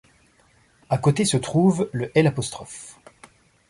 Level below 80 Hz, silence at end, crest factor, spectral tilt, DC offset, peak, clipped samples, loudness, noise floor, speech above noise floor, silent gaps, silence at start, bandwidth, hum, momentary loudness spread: -56 dBFS; 0.75 s; 20 dB; -5.5 dB/octave; under 0.1%; -4 dBFS; under 0.1%; -22 LUFS; -59 dBFS; 38 dB; none; 0.9 s; 11.5 kHz; none; 18 LU